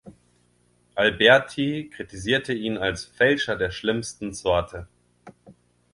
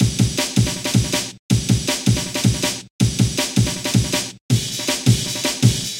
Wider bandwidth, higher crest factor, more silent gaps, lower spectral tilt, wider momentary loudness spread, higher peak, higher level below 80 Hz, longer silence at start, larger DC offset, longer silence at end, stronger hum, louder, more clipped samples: second, 11.5 kHz vs 16.5 kHz; about the same, 22 dB vs 18 dB; second, none vs 1.39-1.49 s, 2.90-2.99 s, 4.41-4.49 s; about the same, -4 dB/octave vs -4 dB/octave; first, 16 LU vs 4 LU; about the same, -2 dBFS vs 0 dBFS; second, -48 dBFS vs -36 dBFS; about the same, 0.05 s vs 0 s; neither; first, 0.4 s vs 0 s; first, 60 Hz at -55 dBFS vs none; second, -23 LUFS vs -19 LUFS; neither